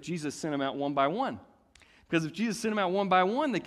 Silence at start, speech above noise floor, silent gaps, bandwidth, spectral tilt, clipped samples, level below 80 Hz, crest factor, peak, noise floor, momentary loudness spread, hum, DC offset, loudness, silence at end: 0 s; 31 dB; none; 14 kHz; -5 dB/octave; under 0.1%; -68 dBFS; 18 dB; -12 dBFS; -60 dBFS; 9 LU; none; under 0.1%; -29 LUFS; 0 s